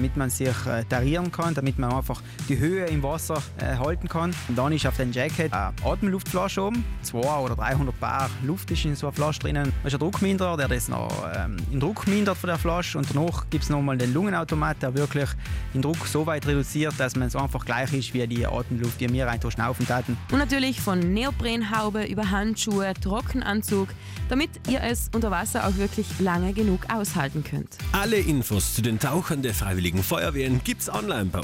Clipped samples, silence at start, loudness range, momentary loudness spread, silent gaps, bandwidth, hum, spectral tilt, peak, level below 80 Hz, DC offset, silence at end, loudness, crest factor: under 0.1%; 0 s; 1 LU; 4 LU; none; 16.5 kHz; none; -5.5 dB/octave; -12 dBFS; -36 dBFS; under 0.1%; 0 s; -26 LUFS; 14 dB